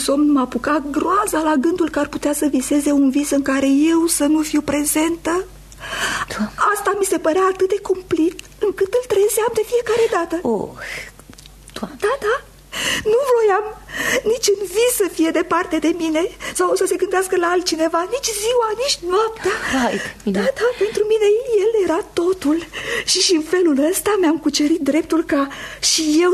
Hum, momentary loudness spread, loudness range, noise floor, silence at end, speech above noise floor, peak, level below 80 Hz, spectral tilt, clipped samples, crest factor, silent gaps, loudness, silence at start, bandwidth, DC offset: none; 7 LU; 3 LU; -41 dBFS; 0 s; 24 dB; -4 dBFS; -46 dBFS; -3 dB/octave; under 0.1%; 14 dB; none; -18 LUFS; 0 s; 13.5 kHz; under 0.1%